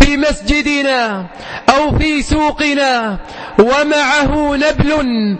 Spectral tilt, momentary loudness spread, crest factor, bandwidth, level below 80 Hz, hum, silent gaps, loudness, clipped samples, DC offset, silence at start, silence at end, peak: -4.5 dB/octave; 6 LU; 12 dB; 8.8 kHz; -24 dBFS; none; none; -13 LUFS; 0.2%; under 0.1%; 0 s; 0 s; 0 dBFS